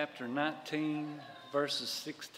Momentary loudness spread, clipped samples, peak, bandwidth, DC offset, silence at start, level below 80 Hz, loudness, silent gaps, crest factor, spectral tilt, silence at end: 6 LU; under 0.1%; -18 dBFS; 16 kHz; under 0.1%; 0 s; -84 dBFS; -36 LUFS; none; 20 dB; -4 dB/octave; 0 s